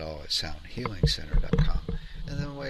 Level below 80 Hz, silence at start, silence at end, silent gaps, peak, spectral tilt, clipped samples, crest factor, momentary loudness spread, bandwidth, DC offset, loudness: -30 dBFS; 0 s; 0 s; none; -10 dBFS; -5 dB/octave; under 0.1%; 18 dB; 10 LU; 12.5 kHz; under 0.1%; -30 LUFS